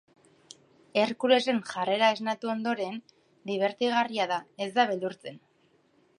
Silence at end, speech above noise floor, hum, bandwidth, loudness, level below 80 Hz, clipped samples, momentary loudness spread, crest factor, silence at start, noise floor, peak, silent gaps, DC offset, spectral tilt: 0.8 s; 38 dB; none; 11.5 kHz; -28 LUFS; -82 dBFS; under 0.1%; 12 LU; 20 dB; 0.95 s; -66 dBFS; -8 dBFS; none; under 0.1%; -4.5 dB/octave